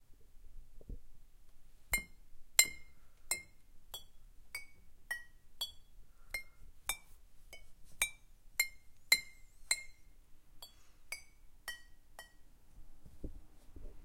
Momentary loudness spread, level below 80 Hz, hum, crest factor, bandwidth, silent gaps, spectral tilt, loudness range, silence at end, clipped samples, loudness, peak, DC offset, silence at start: 26 LU; -56 dBFS; none; 36 dB; 16.5 kHz; none; 1 dB/octave; 15 LU; 0 s; under 0.1%; -38 LUFS; -8 dBFS; under 0.1%; 0 s